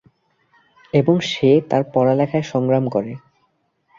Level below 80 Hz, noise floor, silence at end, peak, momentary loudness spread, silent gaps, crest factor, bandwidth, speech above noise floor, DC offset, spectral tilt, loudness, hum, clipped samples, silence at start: -60 dBFS; -66 dBFS; 0.8 s; -2 dBFS; 8 LU; none; 18 dB; 7.6 kHz; 49 dB; under 0.1%; -7 dB/octave; -18 LUFS; none; under 0.1%; 0.95 s